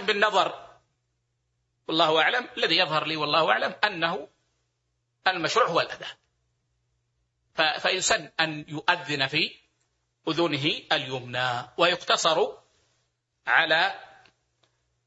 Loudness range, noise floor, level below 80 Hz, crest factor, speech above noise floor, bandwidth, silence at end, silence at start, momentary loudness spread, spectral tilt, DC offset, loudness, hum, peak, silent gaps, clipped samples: 4 LU; -77 dBFS; -70 dBFS; 22 dB; 51 dB; 8.2 kHz; 1 s; 0 s; 9 LU; -2.5 dB/octave; under 0.1%; -24 LUFS; none; -6 dBFS; none; under 0.1%